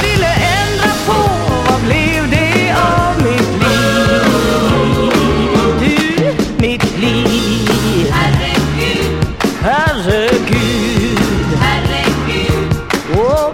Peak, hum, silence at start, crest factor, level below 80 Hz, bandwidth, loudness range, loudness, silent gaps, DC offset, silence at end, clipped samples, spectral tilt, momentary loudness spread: 0 dBFS; none; 0 s; 12 dB; -26 dBFS; 16.5 kHz; 2 LU; -13 LUFS; none; under 0.1%; 0 s; under 0.1%; -5 dB/octave; 3 LU